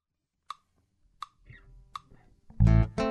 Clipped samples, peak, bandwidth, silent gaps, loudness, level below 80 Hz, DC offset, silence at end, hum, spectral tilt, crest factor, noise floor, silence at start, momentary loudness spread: under 0.1%; -10 dBFS; 8.2 kHz; none; -25 LUFS; -34 dBFS; under 0.1%; 0 s; none; -8.5 dB/octave; 20 dB; -80 dBFS; 2.6 s; 23 LU